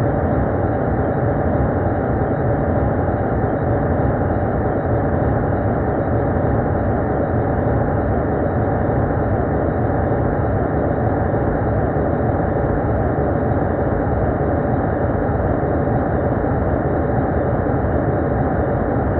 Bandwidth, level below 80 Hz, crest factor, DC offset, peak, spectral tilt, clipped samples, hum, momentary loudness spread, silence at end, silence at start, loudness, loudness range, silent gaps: 4.1 kHz; -28 dBFS; 14 dB; under 0.1%; -4 dBFS; -10 dB/octave; under 0.1%; none; 1 LU; 0 s; 0 s; -19 LUFS; 0 LU; none